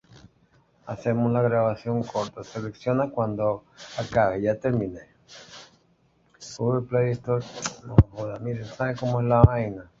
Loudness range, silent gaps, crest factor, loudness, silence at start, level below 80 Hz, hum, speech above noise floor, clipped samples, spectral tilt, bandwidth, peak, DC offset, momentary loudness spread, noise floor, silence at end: 5 LU; none; 24 dB; -25 LUFS; 0.85 s; -38 dBFS; none; 40 dB; under 0.1%; -7 dB/octave; 7.8 kHz; -2 dBFS; under 0.1%; 16 LU; -64 dBFS; 0.15 s